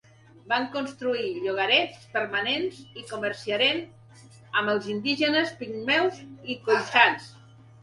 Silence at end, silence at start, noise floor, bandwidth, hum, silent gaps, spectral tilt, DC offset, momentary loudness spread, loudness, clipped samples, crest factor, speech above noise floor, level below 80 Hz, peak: 0.45 s; 0.45 s; -51 dBFS; 11.5 kHz; none; none; -4 dB/octave; under 0.1%; 12 LU; -25 LUFS; under 0.1%; 26 dB; 25 dB; -70 dBFS; -2 dBFS